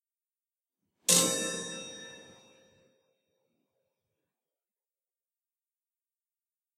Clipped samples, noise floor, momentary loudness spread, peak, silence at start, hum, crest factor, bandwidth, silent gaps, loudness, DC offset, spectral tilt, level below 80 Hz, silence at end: under 0.1%; under -90 dBFS; 22 LU; -6 dBFS; 1.1 s; none; 32 dB; 16 kHz; none; -27 LUFS; under 0.1%; -1 dB/octave; -80 dBFS; 4.55 s